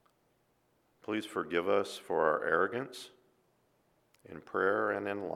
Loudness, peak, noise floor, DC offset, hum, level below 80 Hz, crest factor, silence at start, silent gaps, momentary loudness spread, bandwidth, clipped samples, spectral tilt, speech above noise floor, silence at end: -33 LUFS; -14 dBFS; -73 dBFS; under 0.1%; none; -76 dBFS; 22 dB; 1.1 s; none; 19 LU; 14.5 kHz; under 0.1%; -5 dB/octave; 40 dB; 0 s